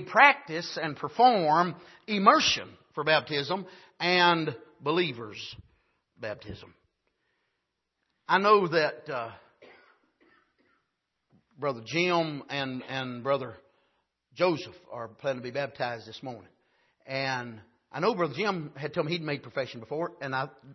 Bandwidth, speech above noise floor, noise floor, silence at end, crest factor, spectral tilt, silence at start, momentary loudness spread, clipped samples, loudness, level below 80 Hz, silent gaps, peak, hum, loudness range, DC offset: 6.2 kHz; 53 dB; -81 dBFS; 0 s; 26 dB; -4.5 dB/octave; 0 s; 20 LU; under 0.1%; -27 LUFS; -70 dBFS; none; -4 dBFS; none; 10 LU; under 0.1%